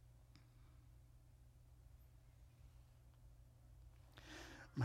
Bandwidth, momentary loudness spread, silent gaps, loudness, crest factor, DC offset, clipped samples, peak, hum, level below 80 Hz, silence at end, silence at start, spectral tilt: 16 kHz; 11 LU; none; -63 LUFS; 26 dB; under 0.1%; under 0.1%; -30 dBFS; none; -66 dBFS; 0 s; 0 s; -6 dB/octave